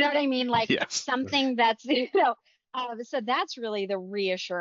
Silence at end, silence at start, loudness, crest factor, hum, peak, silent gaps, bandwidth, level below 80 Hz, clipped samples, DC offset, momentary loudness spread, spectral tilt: 0 s; 0 s; -27 LUFS; 16 dB; none; -10 dBFS; none; 7.6 kHz; -76 dBFS; under 0.1%; under 0.1%; 10 LU; -1.5 dB/octave